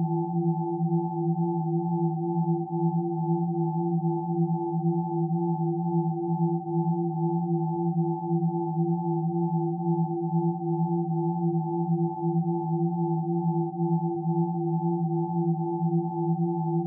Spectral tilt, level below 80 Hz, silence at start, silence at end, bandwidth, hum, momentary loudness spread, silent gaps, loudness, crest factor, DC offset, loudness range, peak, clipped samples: -5.5 dB/octave; -78 dBFS; 0 s; 0 s; 1 kHz; none; 1 LU; none; -27 LUFS; 10 dB; under 0.1%; 0 LU; -16 dBFS; under 0.1%